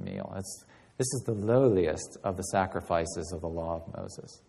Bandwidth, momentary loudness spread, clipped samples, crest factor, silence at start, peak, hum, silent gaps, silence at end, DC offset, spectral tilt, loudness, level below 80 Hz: 12.5 kHz; 17 LU; under 0.1%; 18 dB; 0 s; -12 dBFS; none; none; 0.1 s; under 0.1%; -5.5 dB/octave; -30 LUFS; -54 dBFS